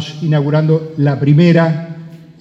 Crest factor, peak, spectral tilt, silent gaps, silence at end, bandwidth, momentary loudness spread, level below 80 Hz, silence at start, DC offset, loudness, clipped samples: 12 dB; 0 dBFS; -8.5 dB/octave; none; 0.25 s; 6.8 kHz; 14 LU; -58 dBFS; 0 s; under 0.1%; -13 LUFS; under 0.1%